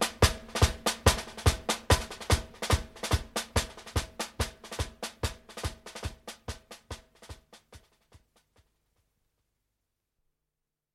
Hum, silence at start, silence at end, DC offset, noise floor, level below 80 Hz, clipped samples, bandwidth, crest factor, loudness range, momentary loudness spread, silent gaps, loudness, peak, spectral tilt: none; 0 s; 3.15 s; under 0.1%; -87 dBFS; -38 dBFS; under 0.1%; 16 kHz; 26 dB; 20 LU; 19 LU; none; -31 LUFS; -8 dBFS; -3.5 dB/octave